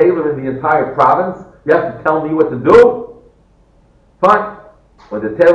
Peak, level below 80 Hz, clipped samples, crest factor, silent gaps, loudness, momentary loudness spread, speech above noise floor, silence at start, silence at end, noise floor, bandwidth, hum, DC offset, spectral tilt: 0 dBFS; -46 dBFS; under 0.1%; 14 dB; none; -13 LUFS; 17 LU; 38 dB; 0 s; 0 s; -50 dBFS; 8.2 kHz; none; under 0.1%; -7.5 dB/octave